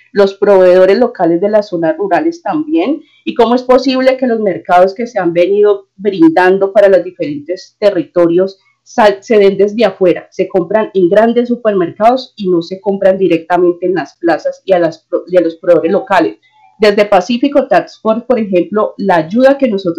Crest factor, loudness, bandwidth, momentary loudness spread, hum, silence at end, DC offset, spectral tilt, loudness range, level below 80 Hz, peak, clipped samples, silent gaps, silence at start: 10 dB; -11 LUFS; 9.2 kHz; 7 LU; none; 0 s; 0.1%; -6.5 dB/octave; 2 LU; -52 dBFS; 0 dBFS; 0.5%; none; 0.15 s